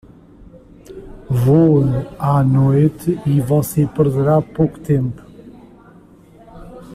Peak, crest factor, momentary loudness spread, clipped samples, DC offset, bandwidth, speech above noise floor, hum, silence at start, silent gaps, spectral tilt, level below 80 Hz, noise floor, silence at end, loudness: -2 dBFS; 14 dB; 18 LU; under 0.1%; under 0.1%; 15 kHz; 30 dB; none; 0.9 s; none; -9 dB/octave; -42 dBFS; -45 dBFS; 0 s; -16 LUFS